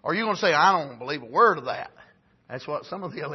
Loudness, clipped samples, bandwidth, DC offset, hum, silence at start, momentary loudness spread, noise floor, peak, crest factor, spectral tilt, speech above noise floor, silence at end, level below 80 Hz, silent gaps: -23 LUFS; under 0.1%; 6.2 kHz; under 0.1%; none; 0.05 s; 17 LU; -56 dBFS; -6 dBFS; 20 dB; -4.5 dB/octave; 32 dB; 0 s; -72 dBFS; none